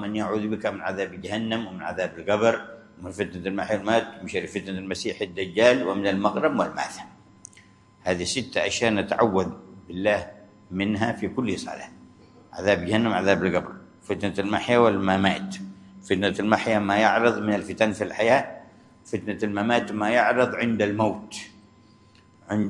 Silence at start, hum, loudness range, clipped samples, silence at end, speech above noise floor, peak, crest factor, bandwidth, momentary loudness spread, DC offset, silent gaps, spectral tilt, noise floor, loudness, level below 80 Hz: 0 s; none; 4 LU; under 0.1%; 0 s; 31 dB; -2 dBFS; 24 dB; 11.5 kHz; 16 LU; under 0.1%; none; -5 dB/octave; -55 dBFS; -24 LUFS; -62 dBFS